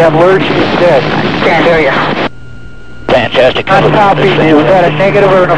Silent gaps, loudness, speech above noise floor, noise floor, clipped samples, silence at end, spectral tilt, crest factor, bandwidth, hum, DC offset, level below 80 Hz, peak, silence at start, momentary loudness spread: none; -8 LUFS; 23 dB; -30 dBFS; 4%; 0 s; -6.5 dB/octave; 8 dB; 11 kHz; none; 6%; -34 dBFS; 0 dBFS; 0 s; 5 LU